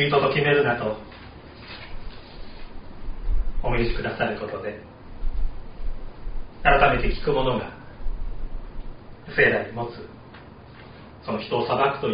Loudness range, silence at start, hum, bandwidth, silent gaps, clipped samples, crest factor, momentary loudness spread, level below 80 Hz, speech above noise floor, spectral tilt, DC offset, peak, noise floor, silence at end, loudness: 6 LU; 0 s; none; 5.2 kHz; none; under 0.1%; 22 dB; 24 LU; -30 dBFS; 22 dB; -3.5 dB/octave; 0.1%; -2 dBFS; -44 dBFS; 0 s; -24 LUFS